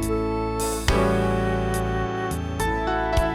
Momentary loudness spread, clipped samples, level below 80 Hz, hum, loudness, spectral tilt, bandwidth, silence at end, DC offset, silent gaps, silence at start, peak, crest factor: 5 LU; under 0.1%; -30 dBFS; none; -24 LUFS; -5.5 dB/octave; 16.5 kHz; 0 s; under 0.1%; none; 0 s; -4 dBFS; 18 dB